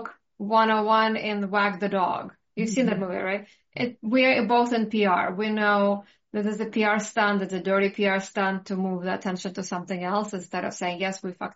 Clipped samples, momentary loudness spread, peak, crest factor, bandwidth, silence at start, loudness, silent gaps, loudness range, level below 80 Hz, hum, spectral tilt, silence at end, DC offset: under 0.1%; 10 LU; -8 dBFS; 18 dB; 8 kHz; 0 s; -25 LUFS; none; 4 LU; -72 dBFS; none; -3.5 dB/octave; 0.05 s; under 0.1%